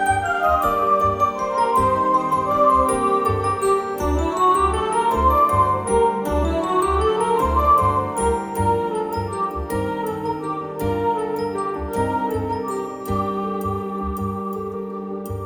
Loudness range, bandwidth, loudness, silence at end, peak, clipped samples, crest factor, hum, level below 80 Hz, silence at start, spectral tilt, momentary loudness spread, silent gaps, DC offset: 6 LU; over 20 kHz; -20 LUFS; 0 s; -6 dBFS; under 0.1%; 14 dB; none; -34 dBFS; 0 s; -6 dB/octave; 9 LU; none; under 0.1%